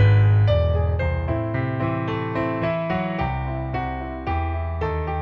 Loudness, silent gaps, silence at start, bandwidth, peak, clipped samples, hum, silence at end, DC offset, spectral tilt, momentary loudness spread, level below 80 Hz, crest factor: -23 LUFS; none; 0 s; 5.2 kHz; -6 dBFS; under 0.1%; none; 0 s; under 0.1%; -9.5 dB/octave; 9 LU; -32 dBFS; 14 dB